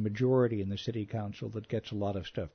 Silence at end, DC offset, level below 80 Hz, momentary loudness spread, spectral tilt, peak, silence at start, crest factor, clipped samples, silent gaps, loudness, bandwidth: 0.05 s; under 0.1%; -60 dBFS; 10 LU; -8 dB/octave; -16 dBFS; 0 s; 16 dB; under 0.1%; none; -33 LUFS; 6.6 kHz